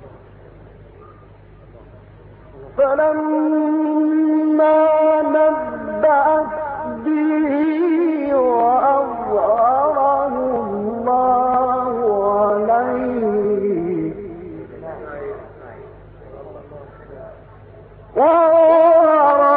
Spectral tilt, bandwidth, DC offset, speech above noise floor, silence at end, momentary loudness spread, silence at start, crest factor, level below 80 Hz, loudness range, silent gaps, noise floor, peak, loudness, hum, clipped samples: -12 dB/octave; 4.1 kHz; under 0.1%; 27 dB; 0 s; 20 LU; 0 s; 12 dB; -50 dBFS; 11 LU; none; -43 dBFS; -4 dBFS; -16 LUFS; none; under 0.1%